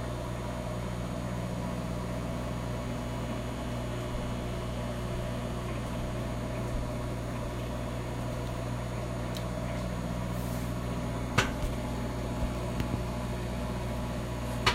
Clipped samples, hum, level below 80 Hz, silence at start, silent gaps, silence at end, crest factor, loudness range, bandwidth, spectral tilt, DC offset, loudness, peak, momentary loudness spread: under 0.1%; 60 Hz at -35 dBFS; -40 dBFS; 0 s; none; 0 s; 24 dB; 2 LU; 16 kHz; -5.5 dB/octave; under 0.1%; -35 LUFS; -10 dBFS; 2 LU